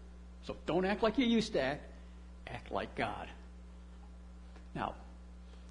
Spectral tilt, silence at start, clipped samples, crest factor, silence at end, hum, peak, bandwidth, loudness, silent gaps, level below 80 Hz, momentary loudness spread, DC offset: -5.5 dB/octave; 0 s; under 0.1%; 20 dB; 0 s; none; -18 dBFS; 10 kHz; -36 LUFS; none; -52 dBFS; 23 LU; under 0.1%